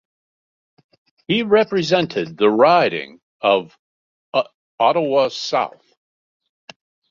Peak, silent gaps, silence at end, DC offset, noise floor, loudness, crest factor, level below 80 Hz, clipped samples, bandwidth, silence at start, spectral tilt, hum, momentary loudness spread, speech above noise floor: -2 dBFS; 3.23-3.40 s, 3.79-4.32 s, 4.54-4.78 s; 1.4 s; under 0.1%; under -90 dBFS; -18 LUFS; 18 dB; -64 dBFS; under 0.1%; 7.4 kHz; 1.3 s; -5 dB/octave; none; 10 LU; over 73 dB